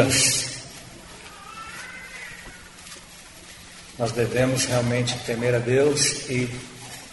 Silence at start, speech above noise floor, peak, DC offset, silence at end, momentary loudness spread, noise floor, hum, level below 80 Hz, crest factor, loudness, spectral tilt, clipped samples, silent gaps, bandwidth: 0 s; 22 dB; -4 dBFS; under 0.1%; 0 s; 22 LU; -45 dBFS; none; -52 dBFS; 20 dB; -22 LUFS; -3.5 dB/octave; under 0.1%; none; 12 kHz